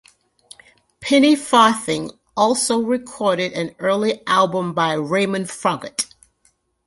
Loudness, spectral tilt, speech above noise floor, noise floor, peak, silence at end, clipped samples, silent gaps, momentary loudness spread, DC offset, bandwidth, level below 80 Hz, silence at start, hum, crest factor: -19 LUFS; -4 dB/octave; 44 dB; -63 dBFS; 0 dBFS; 0.8 s; under 0.1%; none; 11 LU; under 0.1%; 11.5 kHz; -60 dBFS; 1 s; none; 20 dB